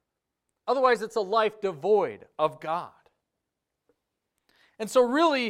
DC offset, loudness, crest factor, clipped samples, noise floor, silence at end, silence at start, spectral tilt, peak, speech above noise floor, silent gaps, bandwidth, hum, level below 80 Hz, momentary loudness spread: under 0.1%; -26 LUFS; 20 dB; under 0.1%; -84 dBFS; 0 s; 0.65 s; -4.5 dB/octave; -8 dBFS; 59 dB; none; 14.5 kHz; none; -74 dBFS; 11 LU